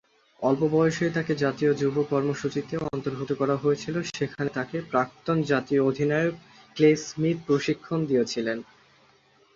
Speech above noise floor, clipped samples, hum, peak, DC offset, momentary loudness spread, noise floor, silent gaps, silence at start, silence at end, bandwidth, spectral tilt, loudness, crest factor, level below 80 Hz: 35 dB; under 0.1%; none; -8 dBFS; under 0.1%; 8 LU; -60 dBFS; none; 0.4 s; 0.9 s; 7.6 kHz; -6.5 dB/octave; -26 LUFS; 18 dB; -62 dBFS